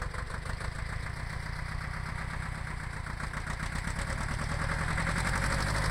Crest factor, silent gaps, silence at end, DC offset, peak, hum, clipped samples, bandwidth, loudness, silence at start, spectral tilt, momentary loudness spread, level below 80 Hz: 16 dB; none; 0 s; under 0.1%; -16 dBFS; none; under 0.1%; 16 kHz; -35 LUFS; 0 s; -4.5 dB/octave; 8 LU; -38 dBFS